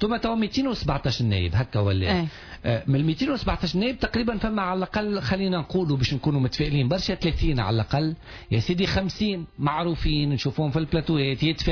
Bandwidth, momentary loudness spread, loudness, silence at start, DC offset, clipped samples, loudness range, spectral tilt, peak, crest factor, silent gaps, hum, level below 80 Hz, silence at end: 5.4 kHz; 3 LU; -25 LUFS; 0 s; under 0.1%; under 0.1%; 1 LU; -7 dB/octave; -12 dBFS; 12 dB; none; none; -36 dBFS; 0 s